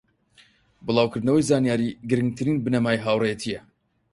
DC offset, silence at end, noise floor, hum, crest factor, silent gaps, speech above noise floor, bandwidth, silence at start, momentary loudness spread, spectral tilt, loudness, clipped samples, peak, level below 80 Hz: under 0.1%; 0.55 s; -58 dBFS; none; 18 dB; none; 36 dB; 11.5 kHz; 0.85 s; 10 LU; -6 dB/octave; -23 LUFS; under 0.1%; -6 dBFS; -56 dBFS